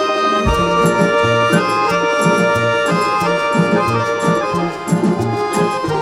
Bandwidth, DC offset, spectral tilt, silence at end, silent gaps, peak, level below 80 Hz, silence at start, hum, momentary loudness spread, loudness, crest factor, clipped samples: 16 kHz; under 0.1%; -5.5 dB/octave; 0 s; none; -2 dBFS; -34 dBFS; 0 s; none; 4 LU; -15 LUFS; 14 dB; under 0.1%